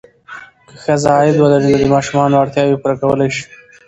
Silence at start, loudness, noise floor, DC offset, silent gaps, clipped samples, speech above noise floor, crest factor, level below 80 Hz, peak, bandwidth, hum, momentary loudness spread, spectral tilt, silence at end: 0.3 s; -13 LUFS; -35 dBFS; under 0.1%; none; under 0.1%; 23 dB; 14 dB; -44 dBFS; 0 dBFS; 8.6 kHz; none; 21 LU; -6.5 dB/octave; 0.45 s